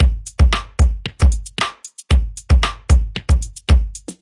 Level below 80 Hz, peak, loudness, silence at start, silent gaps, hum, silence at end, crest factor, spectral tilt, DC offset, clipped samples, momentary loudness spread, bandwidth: -18 dBFS; -2 dBFS; -18 LUFS; 0 s; none; none; 0.1 s; 14 dB; -5 dB/octave; under 0.1%; under 0.1%; 6 LU; 11.5 kHz